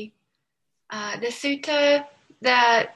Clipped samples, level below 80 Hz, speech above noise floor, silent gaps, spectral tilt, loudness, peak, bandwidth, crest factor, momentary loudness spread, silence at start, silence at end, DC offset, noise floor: under 0.1%; -76 dBFS; 59 dB; none; -2 dB/octave; -22 LUFS; -4 dBFS; 12 kHz; 20 dB; 16 LU; 0 s; 0.05 s; under 0.1%; -81 dBFS